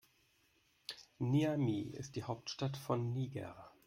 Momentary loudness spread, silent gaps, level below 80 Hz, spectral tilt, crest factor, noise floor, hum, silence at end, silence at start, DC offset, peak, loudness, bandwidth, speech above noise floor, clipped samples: 15 LU; none; -72 dBFS; -6.5 dB/octave; 18 dB; -74 dBFS; none; 0.2 s; 0.9 s; under 0.1%; -22 dBFS; -39 LUFS; 16 kHz; 36 dB; under 0.1%